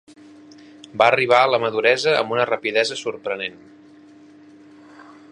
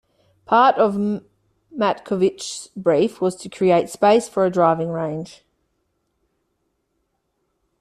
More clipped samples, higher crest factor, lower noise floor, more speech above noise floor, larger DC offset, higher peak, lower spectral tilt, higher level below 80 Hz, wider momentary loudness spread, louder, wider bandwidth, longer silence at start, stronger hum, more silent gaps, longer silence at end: neither; about the same, 22 dB vs 18 dB; second, -47 dBFS vs -72 dBFS; second, 28 dB vs 53 dB; neither; first, 0 dBFS vs -4 dBFS; second, -3.5 dB/octave vs -5.5 dB/octave; second, -72 dBFS vs -62 dBFS; about the same, 12 LU vs 14 LU; about the same, -19 LUFS vs -19 LUFS; second, 11 kHz vs 13.5 kHz; first, 0.95 s vs 0.5 s; neither; neither; second, 0.3 s vs 2.5 s